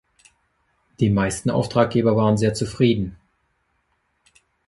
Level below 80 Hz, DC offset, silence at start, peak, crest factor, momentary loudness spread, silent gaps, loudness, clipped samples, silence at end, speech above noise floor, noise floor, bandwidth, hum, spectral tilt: -48 dBFS; under 0.1%; 1 s; -2 dBFS; 20 dB; 5 LU; none; -20 LUFS; under 0.1%; 1.55 s; 50 dB; -69 dBFS; 11.5 kHz; none; -6.5 dB/octave